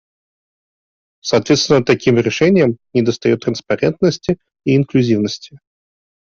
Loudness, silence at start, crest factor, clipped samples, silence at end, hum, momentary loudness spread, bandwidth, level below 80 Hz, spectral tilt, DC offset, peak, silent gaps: -15 LUFS; 1.25 s; 14 dB; under 0.1%; 0.75 s; none; 9 LU; 7.4 kHz; -52 dBFS; -5.5 dB/octave; under 0.1%; -2 dBFS; none